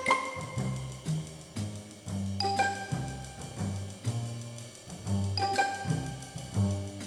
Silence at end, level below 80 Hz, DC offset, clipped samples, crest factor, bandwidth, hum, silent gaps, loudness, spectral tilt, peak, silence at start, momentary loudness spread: 0 s; -56 dBFS; under 0.1%; under 0.1%; 20 dB; 13 kHz; none; none; -34 LUFS; -5 dB/octave; -12 dBFS; 0 s; 13 LU